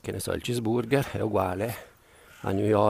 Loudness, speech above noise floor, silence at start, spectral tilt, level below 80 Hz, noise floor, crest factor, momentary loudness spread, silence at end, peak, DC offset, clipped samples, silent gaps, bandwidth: -28 LUFS; 28 dB; 0.05 s; -6 dB/octave; -54 dBFS; -54 dBFS; 18 dB; 8 LU; 0 s; -8 dBFS; under 0.1%; under 0.1%; none; 15.5 kHz